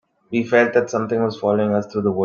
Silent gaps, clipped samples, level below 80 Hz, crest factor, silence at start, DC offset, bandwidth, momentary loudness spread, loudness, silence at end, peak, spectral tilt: none; under 0.1%; -60 dBFS; 18 dB; 0.3 s; under 0.1%; 7.2 kHz; 7 LU; -19 LUFS; 0 s; -2 dBFS; -6.5 dB/octave